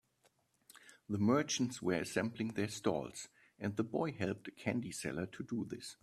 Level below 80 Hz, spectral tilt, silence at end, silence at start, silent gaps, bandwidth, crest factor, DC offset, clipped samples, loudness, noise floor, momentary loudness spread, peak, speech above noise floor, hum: -72 dBFS; -5 dB/octave; 0.1 s; 0.85 s; none; 14.5 kHz; 20 dB; under 0.1%; under 0.1%; -38 LUFS; -75 dBFS; 12 LU; -18 dBFS; 38 dB; none